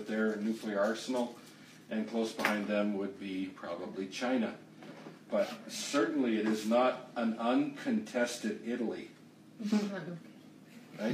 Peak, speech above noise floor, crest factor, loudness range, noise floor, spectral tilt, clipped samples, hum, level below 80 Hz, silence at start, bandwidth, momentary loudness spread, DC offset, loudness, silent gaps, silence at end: -12 dBFS; 21 dB; 22 dB; 4 LU; -54 dBFS; -5 dB/octave; under 0.1%; none; -86 dBFS; 0 s; 15.5 kHz; 19 LU; under 0.1%; -34 LUFS; none; 0 s